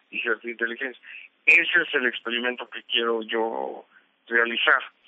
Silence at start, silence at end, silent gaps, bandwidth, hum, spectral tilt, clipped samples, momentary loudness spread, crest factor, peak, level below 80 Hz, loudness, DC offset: 0.1 s; 0.2 s; none; 8.2 kHz; none; -3 dB/octave; under 0.1%; 17 LU; 22 dB; -4 dBFS; under -90 dBFS; -23 LUFS; under 0.1%